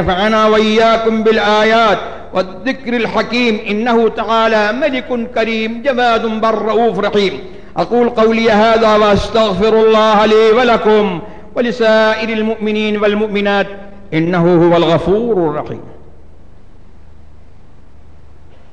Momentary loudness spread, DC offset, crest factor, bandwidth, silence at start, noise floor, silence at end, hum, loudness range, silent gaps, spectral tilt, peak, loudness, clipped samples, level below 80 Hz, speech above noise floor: 9 LU; 3%; 10 dB; 9 kHz; 0 s; -42 dBFS; 2.8 s; none; 4 LU; none; -6 dB/octave; -2 dBFS; -12 LUFS; under 0.1%; -38 dBFS; 30 dB